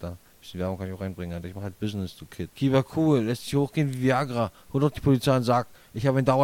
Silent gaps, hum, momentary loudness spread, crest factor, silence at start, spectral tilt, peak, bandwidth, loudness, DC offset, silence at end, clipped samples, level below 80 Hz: none; none; 15 LU; 18 dB; 0 s; -7 dB/octave; -8 dBFS; 16.5 kHz; -26 LUFS; under 0.1%; 0 s; under 0.1%; -52 dBFS